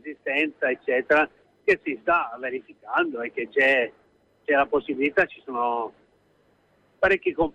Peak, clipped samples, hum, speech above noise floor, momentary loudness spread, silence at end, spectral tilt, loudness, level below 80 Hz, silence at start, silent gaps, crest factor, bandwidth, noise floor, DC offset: -10 dBFS; under 0.1%; none; 39 dB; 10 LU; 0.05 s; -5.5 dB/octave; -24 LUFS; -56 dBFS; 0.05 s; none; 16 dB; 9.4 kHz; -63 dBFS; under 0.1%